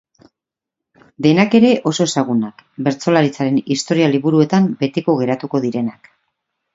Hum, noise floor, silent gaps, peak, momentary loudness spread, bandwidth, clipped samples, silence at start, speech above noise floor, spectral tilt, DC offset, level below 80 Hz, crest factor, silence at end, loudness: none; -84 dBFS; none; 0 dBFS; 9 LU; 7.8 kHz; under 0.1%; 1.2 s; 68 dB; -6 dB/octave; under 0.1%; -62 dBFS; 16 dB; 0.85 s; -16 LUFS